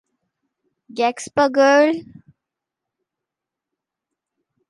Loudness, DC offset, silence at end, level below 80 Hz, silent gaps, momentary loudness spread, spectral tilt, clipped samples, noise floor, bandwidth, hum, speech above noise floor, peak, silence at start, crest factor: -17 LUFS; under 0.1%; 2.65 s; -66 dBFS; none; 13 LU; -3.5 dB/octave; under 0.1%; -85 dBFS; 11.5 kHz; none; 68 dB; -4 dBFS; 0.95 s; 20 dB